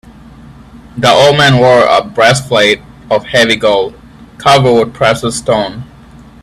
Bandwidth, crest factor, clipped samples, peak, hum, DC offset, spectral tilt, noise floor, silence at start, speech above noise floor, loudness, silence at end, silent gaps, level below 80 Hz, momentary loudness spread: 14.5 kHz; 10 dB; 0.2%; 0 dBFS; none; under 0.1%; -4.5 dB/octave; -36 dBFS; 0.5 s; 27 dB; -9 LUFS; 0.55 s; none; -40 dBFS; 10 LU